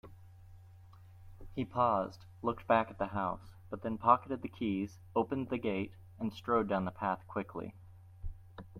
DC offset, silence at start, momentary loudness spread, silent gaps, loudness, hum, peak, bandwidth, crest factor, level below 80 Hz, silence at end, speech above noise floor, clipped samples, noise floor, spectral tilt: under 0.1%; 0.05 s; 16 LU; none; -35 LUFS; none; -12 dBFS; 15.5 kHz; 24 dB; -58 dBFS; 0 s; 21 dB; under 0.1%; -56 dBFS; -8 dB/octave